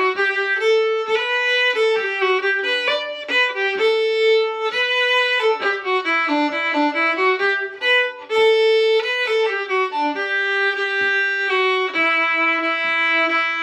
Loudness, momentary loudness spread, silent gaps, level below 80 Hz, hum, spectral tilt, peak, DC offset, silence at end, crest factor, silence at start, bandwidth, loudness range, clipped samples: -18 LUFS; 4 LU; none; -72 dBFS; none; -1.5 dB/octave; -6 dBFS; under 0.1%; 0 s; 12 dB; 0 s; 9.8 kHz; 1 LU; under 0.1%